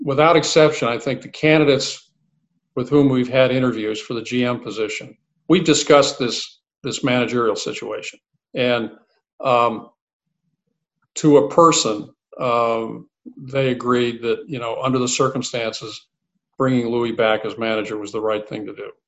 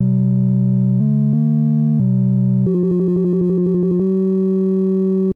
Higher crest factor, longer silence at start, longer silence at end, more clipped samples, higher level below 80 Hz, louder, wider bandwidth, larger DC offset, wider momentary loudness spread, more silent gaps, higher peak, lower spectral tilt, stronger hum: first, 20 dB vs 8 dB; about the same, 0 s vs 0 s; first, 0.15 s vs 0 s; neither; second, -58 dBFS vs -52 dBFS; second, -19 LUFS vs -16 LUFS; first, 8.6 kHz vs 1.9 kHz; neither; first, 17 LU vs 1 LU; first, 9.33-9.38 s, 10.01-10.07 s, 10.13-10.20 s vs none; first, 0 dBFS vs -8 dBFS; second, -4.5 dB/octave vs -13.5 dB/octave; neither